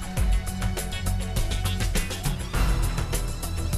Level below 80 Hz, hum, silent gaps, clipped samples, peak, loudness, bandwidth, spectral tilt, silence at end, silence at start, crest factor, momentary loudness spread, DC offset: -28 dBFS; none; none; under 0.1%; -12 dBFS; -28 LUFS; 14 kHz; -4.5 dB/octave; 0 s; 0 s; 12 dB; 3 LU; under 0.1%